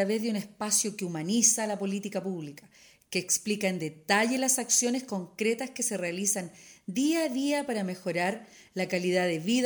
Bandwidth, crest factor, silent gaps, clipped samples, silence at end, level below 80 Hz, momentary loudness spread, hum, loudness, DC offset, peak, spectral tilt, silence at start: over 20 kHz; 20 dB; none; under 0.1%; 0 s; -76 dBFS; 12 LU; none; -28 LUFS; under 0.1%; -10 dBFS; -3 dB/octave; 0 s